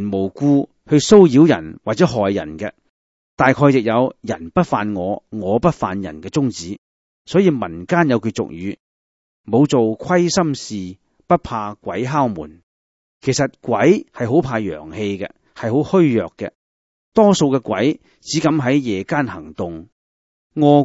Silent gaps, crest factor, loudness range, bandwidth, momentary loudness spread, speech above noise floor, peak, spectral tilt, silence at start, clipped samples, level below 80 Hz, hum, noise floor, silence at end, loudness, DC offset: 2.89-3.37 s, 6.78-7.25 s, 8.80-9.44 s, 12.63-13.21 s, 16.55-17.12 s, 19.92-20.50 s; 18 dB; 5 LU; 8 kHz; 15 LU; over 73 dB; 0 dBFS; -6 dB/octave; 0 s; under 0.1%; -50 dBFS; none; under -90 dBFS; 0 s; -17 LUFS; under 0.1%